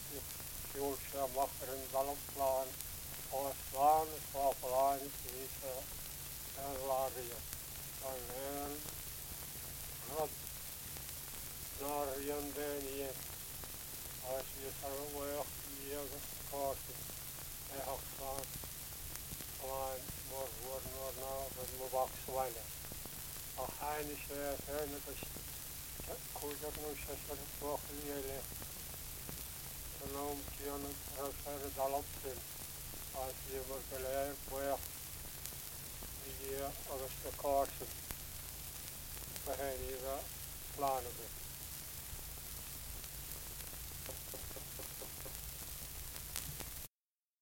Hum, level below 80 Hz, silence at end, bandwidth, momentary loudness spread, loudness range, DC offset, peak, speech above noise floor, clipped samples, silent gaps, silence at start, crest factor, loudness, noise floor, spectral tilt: none; -56 dBFS; 0.55 s; 17 kHz; 7 LU; 6 LU; under 0.1%; -16 dBFS; over 49 dB; under 0.1%; none; 0 s; 28 dB; -42 LUFS; under -90 dBFS; -3 dB/octave